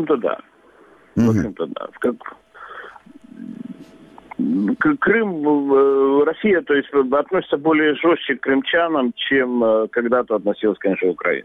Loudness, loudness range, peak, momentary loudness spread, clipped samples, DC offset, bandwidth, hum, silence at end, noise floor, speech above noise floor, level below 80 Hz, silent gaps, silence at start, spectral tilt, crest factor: -18 LUFS; 8 LU; -4 dBFS; 18 LU; under 0.1%; under 0.1%; 6.8 kHz; none; 0 s; -50 dBFS; 32 dB; -56 dBFS; none; 0 s; -7 dB/octave; 14 dB